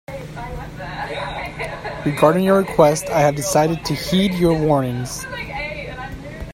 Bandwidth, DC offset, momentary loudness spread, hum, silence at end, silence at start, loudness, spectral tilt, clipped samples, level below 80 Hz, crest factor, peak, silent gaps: 16.5 kHz; under 0.1%; 16 LU; none; 0 s; 0.1 s; -19 LUFS; -5.5 dB/octave; under 0.1%; -40 dBFS; 18 dB; 0 dBFS; none